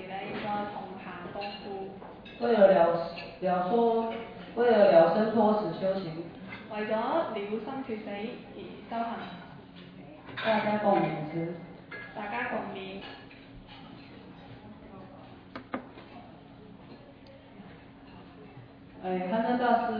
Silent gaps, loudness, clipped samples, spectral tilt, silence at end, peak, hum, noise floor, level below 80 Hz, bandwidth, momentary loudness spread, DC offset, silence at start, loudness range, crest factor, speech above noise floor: none; -29 LUFS; under 0.1%; -9 dB/octave; 0 s; -8 dBFS; none; -51 dBFS; -64 dBFS; 5.2 kHz; 25 LU; under 0.1%; 0 s; 21 LU; 22 dB; 24 dB